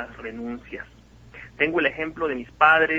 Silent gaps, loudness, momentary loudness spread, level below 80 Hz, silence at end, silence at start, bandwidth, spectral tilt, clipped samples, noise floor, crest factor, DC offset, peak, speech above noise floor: none; -23 LUFS; 24 LU; -52 dBFS; 0 s; 0 s; 7.8 kHz; -6 dB/octave; under 0.1%; -45 dBFS; 22 dB; under 0.1%; -4 dBFS; 22 dB